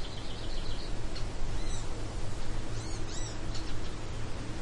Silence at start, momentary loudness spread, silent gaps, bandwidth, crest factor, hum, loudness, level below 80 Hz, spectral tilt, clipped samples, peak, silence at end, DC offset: 0 s; 2 LU; none; 10.5 kHz; 10 dB; none; -40 LUFS; -36 dBFS; -4.5 dB/octave; under 0.1%; -20 dBFS; 0 s; under 0.1%